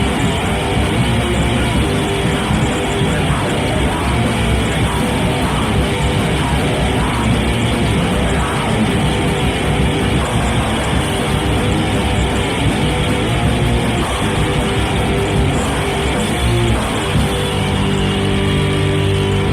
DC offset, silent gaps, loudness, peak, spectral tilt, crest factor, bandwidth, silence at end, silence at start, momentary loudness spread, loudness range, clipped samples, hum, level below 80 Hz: under 0.1%; none; -16 LUFS; -2 dBFS; -5.5 dB/octave; 14 dB; 16 kHz; 0 s; 0 s; 1 LU; 0 LU; under 0.1%; none; -24 dBFS